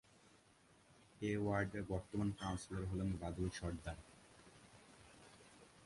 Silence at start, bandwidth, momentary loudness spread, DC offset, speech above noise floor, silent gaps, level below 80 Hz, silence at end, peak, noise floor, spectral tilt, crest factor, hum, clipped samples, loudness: 0.9 s; 11.5 kHz; 23 LU; under 0.1%; 28 dB; none; -58 dBFS; 0 s; -24 dBFS; -70 dBFS; -6.5 dB/octave; 20 dB; none; under 0.1%; -43 LUFS